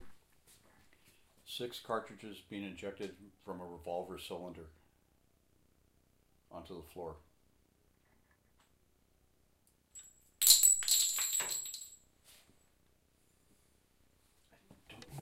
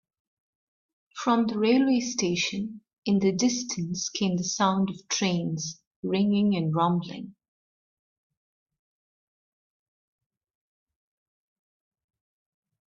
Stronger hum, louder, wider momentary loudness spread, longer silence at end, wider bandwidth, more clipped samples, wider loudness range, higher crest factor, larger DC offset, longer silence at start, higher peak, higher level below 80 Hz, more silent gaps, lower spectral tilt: neither; second, -30 LUFS vs -26 LUFS; first, 27 LU vs 13 LU; second, 0 s vs 5.6 s; first, 16 kHz vs 7.4 kHz; neither; first, 25 LU vs 4 LU; first, 36 dB vs 18 dB; neither; second, 0 s vs 1.15 s; first, -4 dBFS vs -10 dBFS; about the same, -70 dBFS vs -68 dBFS; second, none vs 2.98-3.02 s, 5.87-6.03 s; second, 0 dB/octave vs -4.5 dB/octave